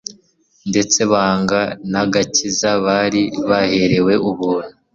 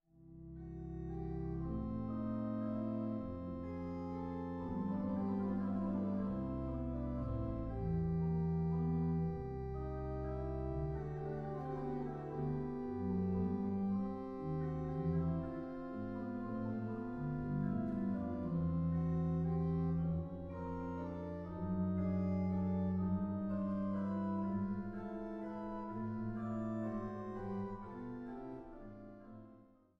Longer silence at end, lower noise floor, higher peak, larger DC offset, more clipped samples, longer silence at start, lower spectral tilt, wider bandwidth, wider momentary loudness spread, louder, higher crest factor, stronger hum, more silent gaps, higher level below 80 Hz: about the same, 0.25 s vs 0.35 s; second, -56 dBFS vs -63 dBFS; first, -2 dBFS vs -26 dBFS; neither; neither; about the same, 0.1 s vs 0.2 s; second, -4 dB/octave vs -11.5 dB/octave; first, 7.6 kHz vs 5.2 kHz; about the same, 6 LU vs 8 LU; first, -16 LUFS vs -40 LUFS; about the same, 14 dB vs 14 dB; neither; neither; about the same, -50 dBFS vs -52 dBFS